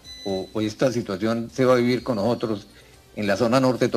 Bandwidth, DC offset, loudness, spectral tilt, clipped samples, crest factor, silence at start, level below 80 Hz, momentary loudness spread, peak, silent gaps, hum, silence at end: 14.5 kHz; under 0.1%; -23 LUFS; -6 dB/octave; under 0.1%; 16 dB; 0.05 s; -56 dBFS; 10 LU; -6 dBFS; none; none; 0 s